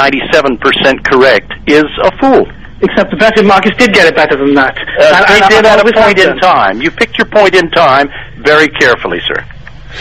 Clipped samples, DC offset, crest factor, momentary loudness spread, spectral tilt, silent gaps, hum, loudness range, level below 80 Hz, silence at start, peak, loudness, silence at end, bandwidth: 3%; 2%; 8 dB; 8 LU; -4.5 dB/octave; none; none; 3 LU; -34 dBFS; 0 s; 0 dBFS; -7 LUFS; 0 s; 15 kHz